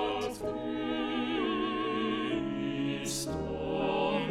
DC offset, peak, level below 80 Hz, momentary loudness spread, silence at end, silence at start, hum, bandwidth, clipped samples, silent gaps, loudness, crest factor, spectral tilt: under 0.1%; -18 dBFS; -54 dBFS; 5 LU; 0 s; 0 s; none; 16 kHz; under 0.1%; none; -33 LUFS; 14 dB; -4.5 dB/octave